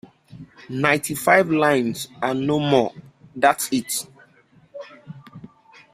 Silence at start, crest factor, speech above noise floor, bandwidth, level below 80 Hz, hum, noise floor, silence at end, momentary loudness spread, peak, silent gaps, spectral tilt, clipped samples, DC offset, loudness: 0.3 s; 22 dB; 35 dB; 16 kHz; -62 dBFS; none; -55 dBFS; 0.5 s; 24 LU; -2 dBFS; none; -4.5 dB/octave; under 0.1%; under 0.1%; -20 LUFS